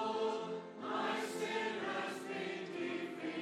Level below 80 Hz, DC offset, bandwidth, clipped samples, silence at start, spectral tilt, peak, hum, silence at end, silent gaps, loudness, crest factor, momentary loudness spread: under -90 dBFS; under 0.1%; 15.5 kHz; under 0.1%; 0 s; -4 dB/octave; -26 dBFS; none; 0 s; none; -40 LUFS; 14 dB; 5 LU